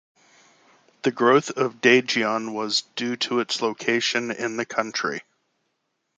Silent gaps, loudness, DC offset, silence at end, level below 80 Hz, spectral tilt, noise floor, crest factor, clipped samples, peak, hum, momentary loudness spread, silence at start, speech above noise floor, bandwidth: none; -23 LUFS; under 0.1%; 0.95 s; -74 dBFS; -3 dB/octave; -76 dBFS; 22 dB; under 0.1%; -2 dBFS; none; 10 LU; 1.05 s; 53 dB; 9.4 kHz